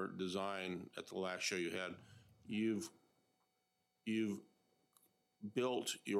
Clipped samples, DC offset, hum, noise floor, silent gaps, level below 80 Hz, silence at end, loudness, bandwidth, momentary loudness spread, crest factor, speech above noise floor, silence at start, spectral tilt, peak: under 0.1%; under 0.1%; none; -84 dBFS; none; -86 dBFS; 0 s; -42 LUFS; 15.5 kHz; 11 LU; 18 dB; 43 dB; 0 s; -4 dB/octave; -26 dBFS